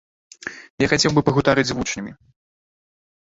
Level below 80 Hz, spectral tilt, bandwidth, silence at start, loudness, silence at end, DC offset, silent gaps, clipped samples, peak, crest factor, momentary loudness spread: -46 dBFS; -4.5 dB/octave; 8 kHz; 0.45 s; -19 LUFS; 1.1 s; under 0.1%; 0.70-0.78 s; under 0.1%; -2 dBFS; 22 dB; 18 LU